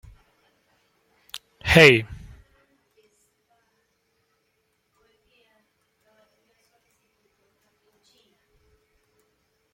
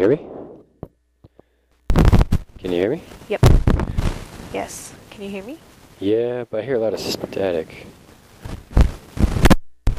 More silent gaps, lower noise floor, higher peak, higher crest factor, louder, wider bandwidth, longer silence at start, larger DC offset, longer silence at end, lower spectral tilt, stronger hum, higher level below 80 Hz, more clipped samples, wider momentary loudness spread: neither; first, -72 dBFS vs -56 dBFS; first, 0 dBFS vs -6 dBFS; first, 28 dB vs 14 dB; first, -16 LUFS vs -21 LUFS; about the same, 16.5 kHz vs 16 kHz; first, 1.35 s vs 0 s; neither; first, 7.6 s vs 0 s; second, -5 dB/octave vs -6.5 dB/octave; neither; second, -50 dBFS vs -24 dBFS; neither; first, 28 LU vs 21 LU